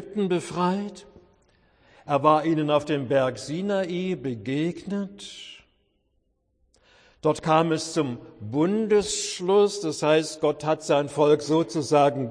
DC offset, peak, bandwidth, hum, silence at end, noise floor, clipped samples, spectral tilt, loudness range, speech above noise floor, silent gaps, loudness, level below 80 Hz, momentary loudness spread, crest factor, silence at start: under 0.1%; -4 dBFS; 10.5 kHz; none; 0 s; -71 dBFS; under 0.1%; -5.5 dB/octave; 8 LU; 47 dB; none; -24 LUFS; -62 dBFS; 10 LU; 22 dB; 0 s